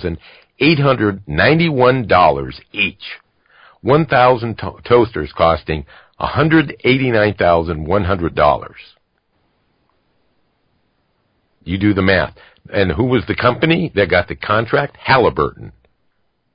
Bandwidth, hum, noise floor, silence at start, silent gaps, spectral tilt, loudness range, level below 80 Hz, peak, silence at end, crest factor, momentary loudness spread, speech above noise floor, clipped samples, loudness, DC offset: 5.4 kHz; none; -64 dBFS; 0 s; none; -11.5 dB/octave; 6 LU; -36 dBFS; 0 dBFS; 0.85 s; 16 dB; 13 LU; 49 dB; under 0.1%; -15 LUFS; under 0.1%